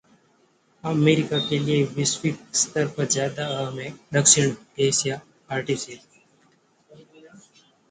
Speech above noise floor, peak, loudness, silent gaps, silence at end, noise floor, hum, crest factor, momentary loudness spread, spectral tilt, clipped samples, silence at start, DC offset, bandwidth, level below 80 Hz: 39 dB; -2 dBFS; -22 LUFS; none; 0.55 s; -62 dBFS; none; 24 dB; 13 LU; -3.5 dB/octave; under 0.1%; 0.85 s; under 0.1%; 9.6 kHz; -64 dBFS